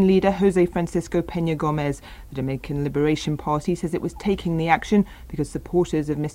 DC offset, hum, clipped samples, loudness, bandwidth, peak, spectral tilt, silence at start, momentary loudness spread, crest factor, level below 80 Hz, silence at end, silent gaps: under 0.1%; none; under 0.1%; -23 LUFS; 16 kHz; -2 dBFS; -7 dB/octave; 0 s; 10 LU; 20 dB; -42 dBFS; 0 s; none